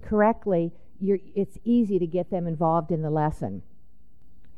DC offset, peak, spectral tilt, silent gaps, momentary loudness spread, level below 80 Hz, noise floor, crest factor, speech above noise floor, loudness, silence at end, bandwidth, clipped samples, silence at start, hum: 1%; -8 dBFS; -10 dB/octave; none; 10 LU; -50 dBFS; -59 dBFS; 18 dB; 34 dB; -26 LUFS; 0.1 s; 10.5 kHz; under 0.1%; 0.05 s; none